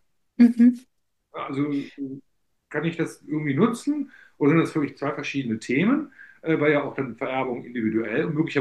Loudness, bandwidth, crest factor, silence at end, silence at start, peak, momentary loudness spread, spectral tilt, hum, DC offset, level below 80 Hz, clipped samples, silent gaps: -24 LUFS; 11.5 kHz; 18 dB; 0 s; 0.4 s; -6 dBFS; 16 LU; -7 dB/octave; none; under 0.1%; -70 dBFS; under 0.1%; none